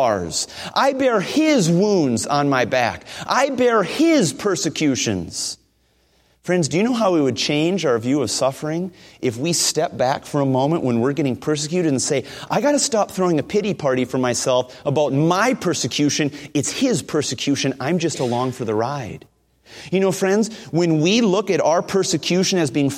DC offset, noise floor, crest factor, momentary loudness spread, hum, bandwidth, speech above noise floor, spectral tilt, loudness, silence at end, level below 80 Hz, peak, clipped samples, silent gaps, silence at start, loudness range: under 0.1%; -61 dBFS; 16 dB; 7 LU; none; 16 kHz; 42 dB; -4.5 dB/octave; -19 LUFS; 0 s; -56 dBFS; -2 dBFS; under 0.1%; none; 0 s; 3 LU